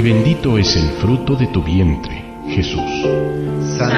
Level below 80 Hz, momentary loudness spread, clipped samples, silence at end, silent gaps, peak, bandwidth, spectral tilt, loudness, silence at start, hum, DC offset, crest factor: -28 dBFS; 7 LU; under 0.1%; 0 s; none; 0 dBFS; 11.5 kHz; -6 dB/octave; -16 LUFS; 0 s; none; under 0.1%; 14 dB